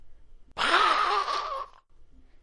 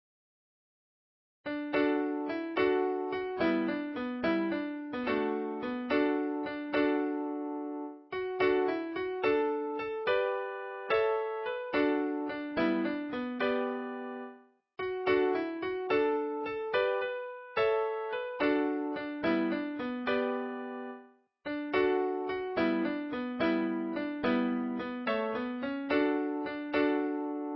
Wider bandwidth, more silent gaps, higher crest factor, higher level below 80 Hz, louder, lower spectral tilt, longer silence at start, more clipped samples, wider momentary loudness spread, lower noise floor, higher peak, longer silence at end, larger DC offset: first, 11.5 kHz vs 5.6 kHz; neither; about the same, 20 dB vs 16 dB; first, -54 dBFS vs -66 dBFS; first, -25 LUFS vs -32 LUFS; second, -1 dB/octave vs -3.5 dB/octave; second, 0 s vs 1.45 s; neither; first, 19 LU vs 9 LU; second, -52 dBFS vs -56 dBFS; first, -8 dBFS vs -16 dBFS; first, 0.4 s vs 0 s; neither